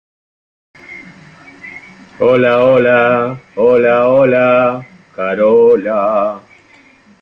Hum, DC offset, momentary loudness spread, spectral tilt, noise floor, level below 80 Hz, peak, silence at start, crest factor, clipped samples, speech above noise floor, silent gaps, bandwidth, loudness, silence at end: none; under 0.1%; 23 LU; -8 dB/octave; -46 dBFS; -54 dBFS; 0 dBFS; 0.9 s; 12 dB; under 0.1%; 35 dB; none; 6 kHz; -11 LUFS; 0.85 s